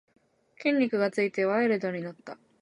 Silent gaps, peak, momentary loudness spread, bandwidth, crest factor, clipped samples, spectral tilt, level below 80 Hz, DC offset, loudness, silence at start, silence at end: none; -14 dBFS; 15 LU; 11 kHz; 16 dB; under 0.1%; -6.5 dB/octave; -80 dBFS; under 0.1%; -27 LUFS; 0.6 s; 0.25 s